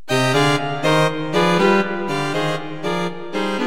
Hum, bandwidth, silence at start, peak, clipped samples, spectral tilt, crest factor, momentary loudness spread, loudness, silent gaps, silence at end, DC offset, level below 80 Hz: none; 16.5 kHz; 0.1 s; -4 dBFS; under 0.1%; -5 dB/octave; 16 dB; 9 LU; -19 LUFS; none; 0 s; 2%; -54 dBFS